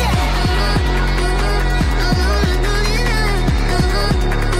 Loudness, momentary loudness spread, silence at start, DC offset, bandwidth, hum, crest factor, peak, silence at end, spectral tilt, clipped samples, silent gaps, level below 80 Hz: -17 LUFS; 1 LU; 0 s; under 0.1%; 14.5 kHz; none; 8 dB; -6 dBFS; 0 s; -5 dB/octave; under 0.1%; none; -18 dBFS